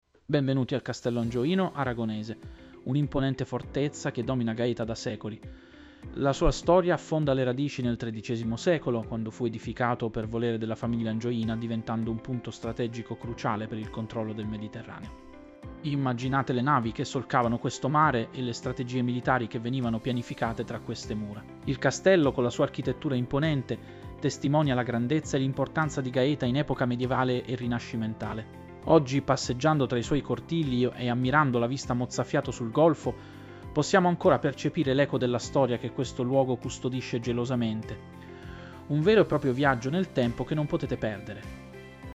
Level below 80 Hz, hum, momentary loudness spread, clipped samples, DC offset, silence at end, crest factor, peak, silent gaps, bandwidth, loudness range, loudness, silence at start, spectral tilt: -48 dBFS; none; 14 LU; under 0.1%; under 0.1%; 0 s; 20 dB; -8 dBFS; none; 8.2 kHz; 5 LU; -28 LUFS; 0.3 s; -6.5 dB/octave